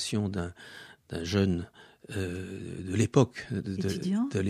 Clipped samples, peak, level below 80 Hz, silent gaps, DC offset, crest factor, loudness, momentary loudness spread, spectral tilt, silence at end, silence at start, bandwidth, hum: under 0.1%; -8 dBFS; -56 dBFS; none; under 0.1%; 24 dB; -31 LUFS; 15 LU; -6 dB/octave; 0 s; 0 s; 14 kHz; none